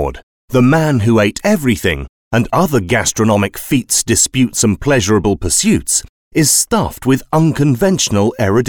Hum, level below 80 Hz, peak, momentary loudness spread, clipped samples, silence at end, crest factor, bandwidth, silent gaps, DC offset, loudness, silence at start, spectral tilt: none; -36 dBFS; -2 dBFS; 5 LU; under 0.1%; 0 s; 12 dB; over 20 kHz; 0.23-0.48 s, 2.09-2.31 s, 6.09-6.31 s; 0.5%; -13 LUFS; 0 s; -4.5 dB/octave